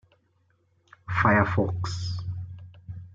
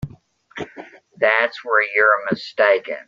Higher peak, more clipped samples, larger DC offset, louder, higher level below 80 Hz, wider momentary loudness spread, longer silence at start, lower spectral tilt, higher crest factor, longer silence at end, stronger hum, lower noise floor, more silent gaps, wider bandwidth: second, -8 dBFS vs -2 dBFS; neither; neither; second, -26 LUFS vs -17 LUFS; about the same, -54 dBFS vs -56 dBFS; first, 22 LU vs 19 LU; first, 1.05 s vs 0 s; about the same, -6.5 dB/octave vs -5.5 dB/octave; about the same, 20 dB vs 18 dB; about the same, 0.05 s vs 0.05 s; neither; first, -68 dBFS vs -47 dBFS; neither; about the same, 7.6 kHz vs 7.6 kHz